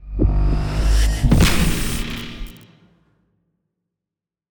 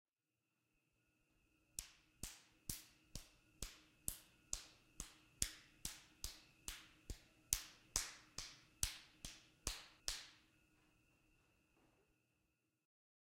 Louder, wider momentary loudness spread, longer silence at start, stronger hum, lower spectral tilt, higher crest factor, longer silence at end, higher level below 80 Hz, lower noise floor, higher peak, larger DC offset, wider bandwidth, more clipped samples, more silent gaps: first, -19 LUFS vs -49 LUFS; first, 17 LU vs 14 LU; second, 0 s vs 1.75 s; neither; first, -5 dB/octave vs -0.5 dB/octave; second, 16 dB vs 42 dB; second, 2 s vs 2.85 s; first, -22 dBFS vs -62 dBFS; about the same, -87 dBFS vs under -90 dBFS; first, -2 dBFS vs -12 dBFS; neither; first, over 20 kHz vs 16 kHz; neither; neither